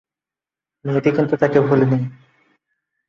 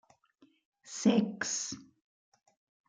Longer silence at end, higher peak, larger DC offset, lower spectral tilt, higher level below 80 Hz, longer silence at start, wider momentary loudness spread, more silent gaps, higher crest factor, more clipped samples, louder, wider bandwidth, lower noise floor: about the same, 0.95 s vs 1.05 s; first, -2 dBFS vs -14 dBFS; neither; first, -9 dB/octave vs -4 dB/octave; first, -58 dBFS vs -76 dBFS; about the same, 0.85 s vs 0.85 s; second, 11 LU vs 16 LU; neither; about the same, 18 dB vs 22 dB; neither; first, -17 LUFS vs -31 LUFS; second, 7 kHz vs 9.6 kHz; first, -89 dBFS vs -68 dBFS